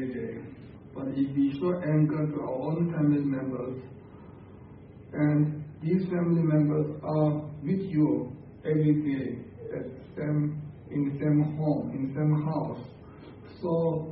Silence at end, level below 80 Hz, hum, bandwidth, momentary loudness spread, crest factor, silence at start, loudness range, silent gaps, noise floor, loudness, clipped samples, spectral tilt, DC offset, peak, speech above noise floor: 0 s; -58 dBFS; none; 4.6 kHz; 22 LU; 16 dB; 0 s; 3 LU; none; -48 dBFS; -28 LUFS; under 0.1%; -13 dB/octave; under 0.1%; -14 dBFS; 21 dB